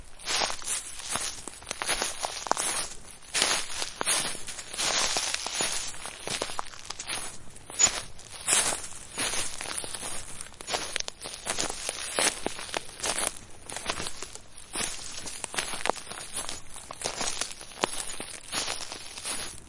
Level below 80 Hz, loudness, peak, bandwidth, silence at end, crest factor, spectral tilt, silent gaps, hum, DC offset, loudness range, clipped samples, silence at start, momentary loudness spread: -52 dBFS; -30 LUFS; -2 dBFS; 11.5 kHz; 0 s; 30 dB; 0 dB/octave; none; none; under 0.1%; 5 LU; under 0.1%; 0 s; 13 LU